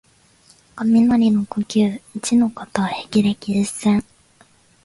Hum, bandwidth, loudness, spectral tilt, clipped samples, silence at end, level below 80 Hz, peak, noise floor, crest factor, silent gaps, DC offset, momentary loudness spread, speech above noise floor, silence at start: none; 11.5 kHz; -19 LUFS; -5.5 dB/octave; under 0.1%; 0.85 s; -54 dBFS; -2 dBFS; -54 dBFS; 18 dB; none; under 0.1%; 8 LU; 36 dB; 0.75 s